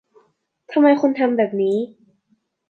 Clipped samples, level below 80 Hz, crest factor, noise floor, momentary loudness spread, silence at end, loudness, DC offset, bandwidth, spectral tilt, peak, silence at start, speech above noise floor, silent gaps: under 0.1%; -76 dBFS; 18 dB; -66 dBFS; 9 LU; 0.8 s; -18 LUFS; under 0.1%; 6.2 kHz; -7.5 dB/octave; -2 dBFS; 0.7 s; 49 dB; none